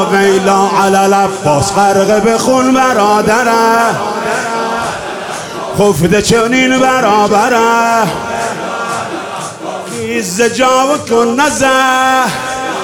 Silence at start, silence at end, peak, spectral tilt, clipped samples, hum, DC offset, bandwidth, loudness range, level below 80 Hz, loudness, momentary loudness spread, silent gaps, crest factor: 0 s; 0 s; 0 dBFS; -4 dB/octave; under 0.1%; none; under 0.1%; 18 kHz; 4 LU; -42 dBFS; -11 LUFS; 10 LU; none; 10 dB